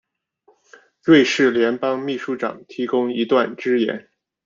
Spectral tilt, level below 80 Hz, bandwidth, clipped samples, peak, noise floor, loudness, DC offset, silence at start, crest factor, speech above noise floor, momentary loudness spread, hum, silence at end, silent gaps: -5 dB/octave; -66 dBFS; 7.6 kHz; under 0.1%; -2 dBFS; -60 dBFS; -19 LUFS; under 0.1%; 1.05 s; 18 dB; 41 dB; 13 LU; none; 0.45 s; none